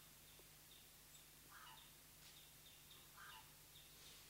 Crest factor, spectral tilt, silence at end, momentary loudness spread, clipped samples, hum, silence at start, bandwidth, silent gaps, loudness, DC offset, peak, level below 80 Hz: 16 dB; -1.5 dB/octave; 0 s; 3 LU; under 0.1%; none; 0 s; 16 kHz; none; -61 LUFS; under 0.1%; -48 dBFS; -78 dBFS